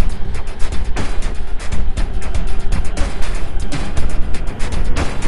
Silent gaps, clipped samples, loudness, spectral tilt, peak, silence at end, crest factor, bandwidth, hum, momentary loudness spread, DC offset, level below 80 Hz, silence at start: none; under 0.1%; -25 LUFS; -5 dB/octave; 0 dBFS; 0 s; 10 dB; 11 kHz; none; 5 LU; under 0.1%; -18 dBFS; 0 s